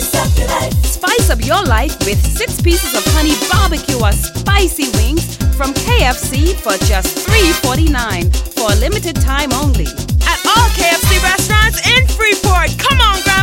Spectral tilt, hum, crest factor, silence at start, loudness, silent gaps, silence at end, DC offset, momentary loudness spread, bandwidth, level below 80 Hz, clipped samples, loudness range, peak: -3.5 dB/octave; none; 12 dB; 0 s; -13 LUFS; none; 0 s; under 0.1%; 6 LU; 16.5 kHz; -16 dBFS; under 0.1%; 3 LU; 0 dBFS